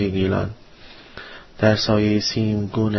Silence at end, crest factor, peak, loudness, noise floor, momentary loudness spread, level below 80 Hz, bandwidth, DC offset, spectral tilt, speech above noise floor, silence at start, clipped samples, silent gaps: 0 s; 18 dB; -4 dBFS; -20 LUFS; -44 dBFS; 20 LU; -44 dBFS; 6.2 kHz; under 0.1%; -6 dB/octave; 24 dB; 0 s; under 0.1%; none